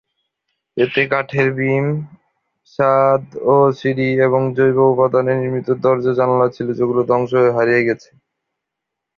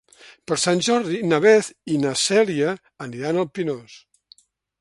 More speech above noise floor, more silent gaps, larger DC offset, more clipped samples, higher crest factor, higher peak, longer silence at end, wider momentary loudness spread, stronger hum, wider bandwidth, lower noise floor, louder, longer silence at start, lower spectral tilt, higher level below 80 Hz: first, 65 dB vs 35 dB; neither; neither; neither; about the same, 16 dB vs 18 dB; about the same, -2 dBFS vs -2 dBFS; first, 1.2 s vs 0.85 s; second, 7 LU vs 13 LU; neither; second, 6.6 kHz vs 11.5 kHz; first, -80 dBFS vs -55 dBFS; first, -16 LUFS vs -20 LUFS; first, 0.75 s vs 0.3 s; first, -8.5 dB/octave vs -4 dB/octave; first, -58 dBFS vs -66 dBFS